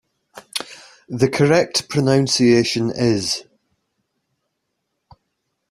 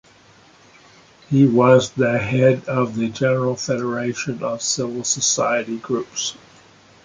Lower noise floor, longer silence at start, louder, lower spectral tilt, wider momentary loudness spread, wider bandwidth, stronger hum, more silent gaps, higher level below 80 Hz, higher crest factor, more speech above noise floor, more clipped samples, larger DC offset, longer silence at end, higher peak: first, -75 dBFS vs -50 dBFS; second, 0.35 s vs 1.3 s; about the same, -18 LUFS vs -19 LUFS; about the same, -5 dB/octave vs -4.5 dB/octave; first, 13 LU vs 10 LU; first, 14.5 kHz vs 9.6 kHz; neither; neither; about the same, -54 dBFS vs -56 dBFS; about the same, 20 dB vs 20 dB; first, 58 dB vs 31 dB; neither; neither; first, 2.3 s vs 0.7 s; about the same, -2 dBFS vs 0 dBFS